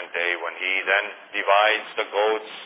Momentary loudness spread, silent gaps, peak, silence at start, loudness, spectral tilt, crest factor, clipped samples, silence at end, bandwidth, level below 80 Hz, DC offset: 8 LU; none; -4 dBFS; 0 s; -22 LUFS; -4 dB/octave; 20 dB; under 0.1%; 0 s; 4 kHz; under -90 dBFS; under 0.1%